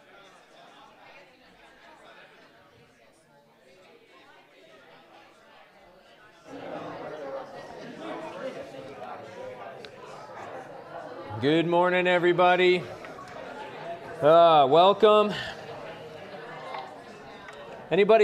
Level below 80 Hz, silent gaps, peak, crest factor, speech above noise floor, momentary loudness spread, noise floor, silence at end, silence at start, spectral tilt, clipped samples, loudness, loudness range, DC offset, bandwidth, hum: -70 dBFS; none; -6 dBFS; 20 dB; 39 dB; 24 LU; -59 dBFS; 0 s; 6.5 s; -6 dB/octave; under 0.1%; -23 LUFS; 20 LU; under 0.1%; 10.5 kHz; none